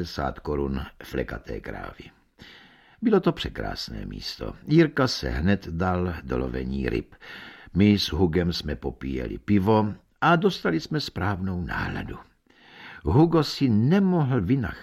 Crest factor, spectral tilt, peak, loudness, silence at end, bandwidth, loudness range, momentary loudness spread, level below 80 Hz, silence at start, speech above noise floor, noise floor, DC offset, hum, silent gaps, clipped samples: 18 dB; -7 dB/octave; -6 dBFS; -25 LUFS; 0 s; 15 kHz; 6 LU; 15 LU; -40 dBFS; 0 s; 29 dB; -54 dBFS; under 0.1%; none; none; under 0.1%